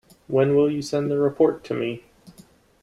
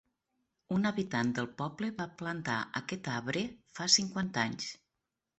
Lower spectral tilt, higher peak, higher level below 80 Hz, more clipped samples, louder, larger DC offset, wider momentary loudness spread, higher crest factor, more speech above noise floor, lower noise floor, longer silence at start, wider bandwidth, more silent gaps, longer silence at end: first, -7 dB/octave vs -3 dB/octave; first, -6 dBFS vs -10 dBFS; first, -60 dBFS vs -70 dBFS; neither; first, -22 LUFS vs -33 LUFS; neither; second, 9 LU vs 12 LU; second, 16 dB vs 26 dB; second, 31 dB vs 53 dB; second, -53 dBFS vs -87 dBFS; second, 0.3 s vs 0.7 s; first, 12 kHz vs 8.2 kHz; neither; second, 0.5 s vs 0.65 s